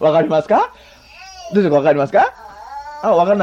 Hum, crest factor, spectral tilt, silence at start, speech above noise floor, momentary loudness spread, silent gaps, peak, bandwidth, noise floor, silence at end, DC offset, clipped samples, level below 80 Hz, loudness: none; 12 dB; -7 dB/octave; 0 s; 24 dB; 20 LU; none; -4 dBFS; 7.8 kHz; -38 dBFS; 0 s; under 0.1%; under 0.1%; -54 dBFS; -15 LUFS